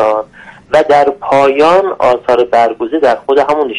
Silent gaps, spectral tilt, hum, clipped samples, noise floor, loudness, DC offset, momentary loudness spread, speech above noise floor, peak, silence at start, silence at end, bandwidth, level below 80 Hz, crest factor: none; -5 dB/octave; none; under 0.1%; -30 dBFS; -10 LUFS; under 0.1%; 5 LU; 20 dB; 0 dBFS; 0 s; 0 s; 11 kHz; -48 dBFS; 10 dB